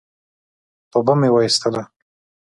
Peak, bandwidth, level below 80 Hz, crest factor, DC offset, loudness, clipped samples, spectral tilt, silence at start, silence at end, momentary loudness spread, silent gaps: -2 dBFS; 11.5 kHz; -62 dBFS; 18 dB; under 0.1%; -17 LUFS; under 0.1%; -5 dB/octave; 0.95 s; 0.65 s; 9 LU; none